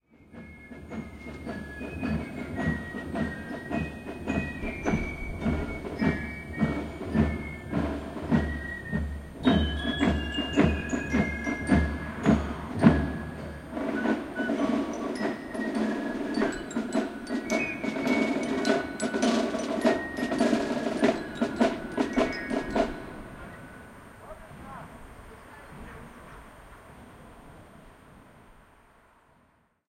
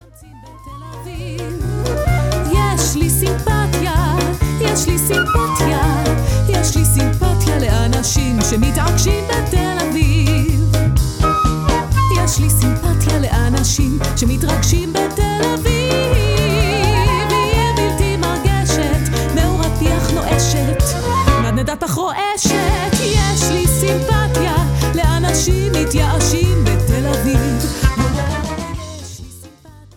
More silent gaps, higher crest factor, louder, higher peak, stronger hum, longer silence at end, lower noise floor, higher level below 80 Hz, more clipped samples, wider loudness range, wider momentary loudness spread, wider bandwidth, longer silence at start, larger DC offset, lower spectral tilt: neither; first, 26 dB vs 14 dB; second, -29 LUFS vs -15 LUFS; second, -4 dBFS vs 0 dBFS; neither; first, 1.25 s vs 0.45 s; first, -66 dBFS vs -40 dBFS; second, -42 dBFS vs -22 dBFS; neither; first, 18 LU vs 1 LU; first, 21 LU vs 4 LU; second, 14.5 kHz vs 18 kHz; about the same, 0.3 s vs 0.2 s; neither; about the same, -6 dB/octave vs -5 dB/octave